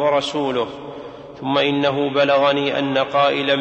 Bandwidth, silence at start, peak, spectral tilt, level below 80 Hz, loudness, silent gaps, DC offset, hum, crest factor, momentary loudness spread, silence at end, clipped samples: 8.6 kHz; 0 s; -4 dBFS; -5.5 dB/octave; -58 dBFS; -18 LUFS; none; under 0.1%; none; 14 dB; 16 LU; 0 s; under 0.1%